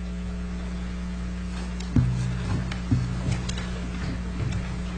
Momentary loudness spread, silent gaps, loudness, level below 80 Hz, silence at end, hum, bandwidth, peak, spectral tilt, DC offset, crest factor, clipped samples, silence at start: 8 LU; none; -29 LUFS; -32 dBFS; 0 s; none; 9.4 kHz; -8 dBFS; -6.5 dB/octave; 0.2%; 20 dB; under 0.1%; 0 s